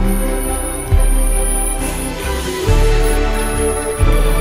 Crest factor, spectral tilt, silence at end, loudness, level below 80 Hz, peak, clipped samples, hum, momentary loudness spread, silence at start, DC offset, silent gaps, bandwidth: 12 dB; -4.5 dB/octave; 0 s; -17 LUFS; -16 dBFS; -2 dBFS; under 0.1%; none; 5 LU; 0 s; under 0.1%; none; 16 kHz